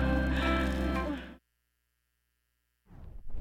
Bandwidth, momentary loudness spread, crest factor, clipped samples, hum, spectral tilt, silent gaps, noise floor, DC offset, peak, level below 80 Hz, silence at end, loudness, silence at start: 13 kHz; 22 LU; 18 dB; under 0.1%; 60 Hz at -65 dBFS; -7 dB/octave; none; -79 dBFS; under 0.1%; -16 dBFS; -38 dBFS; 0 s; -31 LUFS; 0 s